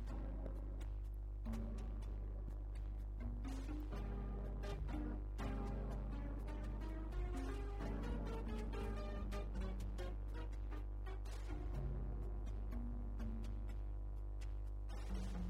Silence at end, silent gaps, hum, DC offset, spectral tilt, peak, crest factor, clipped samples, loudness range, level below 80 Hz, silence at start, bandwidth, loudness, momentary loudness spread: 0 s; none; none; under 0.1%; -7.5 dB/octave; -32 dBFS; 12 dB; under 0.1%; 2 LU; -44 dBFS; 0 s; 9.2 kHz; -48 LUFS; 3 LU